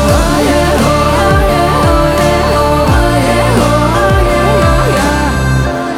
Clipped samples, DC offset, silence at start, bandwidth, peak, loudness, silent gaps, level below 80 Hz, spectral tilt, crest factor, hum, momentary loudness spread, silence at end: under 0.1%; under 0.1%; 0 s; 17 kHz; 0 dBFS; -10 LUFS; none; -16 dBFS; -5.5 dB/octave; 10 dB; none; 2 LU; 0 s